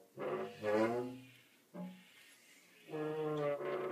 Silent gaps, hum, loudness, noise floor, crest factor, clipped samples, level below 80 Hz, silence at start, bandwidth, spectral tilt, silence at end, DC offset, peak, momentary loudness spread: none; none; -40 LUFS; -64 dBFS; 18 dB; under 0.1%; -86 dBFS; 0 s; 15.5 kHz; -6.5 dB/octave; 0 s; under 0.1%; -22 dBFS; 25 LU